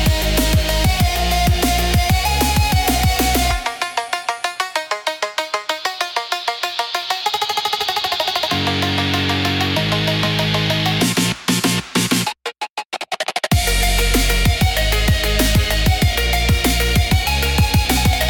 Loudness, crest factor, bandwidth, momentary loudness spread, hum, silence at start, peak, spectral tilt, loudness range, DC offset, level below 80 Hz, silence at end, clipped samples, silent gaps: -17 LUFS; 16 dB; 19 kHz; 6 LU; none; 0 s; -2 dBFS; -4 dB/octave; 5 LU; under 0.1%; -24 dBFS; 0 s; under 0.1%; 12.70-12.75 s, 12.85-12.90 s